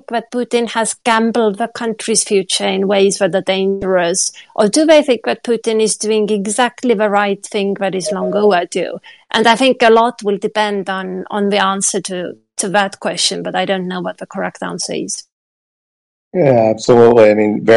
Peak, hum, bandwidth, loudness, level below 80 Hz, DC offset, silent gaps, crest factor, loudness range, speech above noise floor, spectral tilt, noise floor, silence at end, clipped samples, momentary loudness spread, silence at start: 0 dBFS; none; 11.5 kHz; -14 LUFS; -56 dBFS; under 0.1%; 15.32-16.31 s; 14 dB; 5 LU; over 76 dB; -3.5 dB/octave; under -90 dBFS; 0 s; under 0.1%; 12 LU; 0.1 s